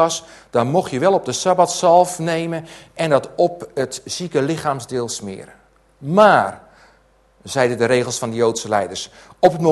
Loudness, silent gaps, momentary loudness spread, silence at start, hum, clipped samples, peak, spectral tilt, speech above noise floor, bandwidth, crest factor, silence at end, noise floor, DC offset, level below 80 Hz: -18 LUFS; none; 13 LU; 0 s; none; under 0.1%; 0 dBFS; -4.5 dB/octave; 37 dB; 12.5 kHz; 18 dB; 0 s; -55 dBFS; under 0.1%; -58 dBFS